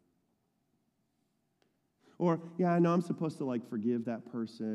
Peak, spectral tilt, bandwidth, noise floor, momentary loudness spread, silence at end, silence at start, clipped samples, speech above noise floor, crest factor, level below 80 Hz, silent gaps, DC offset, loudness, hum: -18 dBFS; -8.5 dB/octave; 10.5 kHz; -78 dBFS; 10 LU; 0 s; 2.2 s; under 0.1%; 46 dB; 16 dB; -88 dBFS; none; under 0.1%; -33 LUFS; none